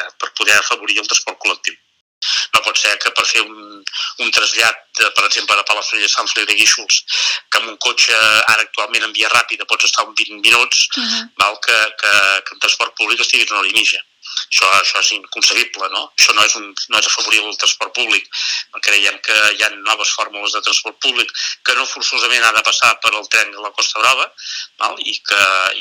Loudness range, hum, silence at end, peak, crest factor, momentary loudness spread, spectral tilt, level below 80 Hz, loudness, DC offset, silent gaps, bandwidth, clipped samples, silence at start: 2 LU; none; 0 s; 0 dBFS; 16 dB; 8 LU; 2 dB/octave; -64 dBFS; -13 LUFS; under 0.1%; 2.01-2.21 s; over 20 kHz; under 0.1%; 0 s